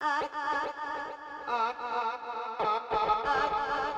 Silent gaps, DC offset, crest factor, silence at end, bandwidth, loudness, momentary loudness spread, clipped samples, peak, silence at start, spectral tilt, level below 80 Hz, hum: none; under 0.1%; 18 dB; 0 s; 9.2 kHz; -31 LUFS; 9 LU; under 0.1%; -14 dBFS; 0 s; -3.5 dB/octave; -58 dBFS; none